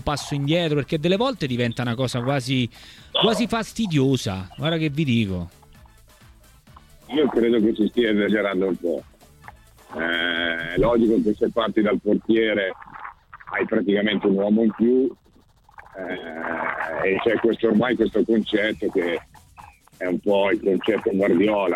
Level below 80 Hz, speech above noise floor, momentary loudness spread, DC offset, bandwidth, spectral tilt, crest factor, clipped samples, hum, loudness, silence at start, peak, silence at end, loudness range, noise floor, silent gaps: -48 dBFS; 34 dB; 10 LU; under 0.1%; 14.5 kHz; -6 dB/octave; 18 dB; under 0.1%; none; -22 LUFS; 0 s; -4 dBFS; 0 s; 2 LU; -55 dBFS; none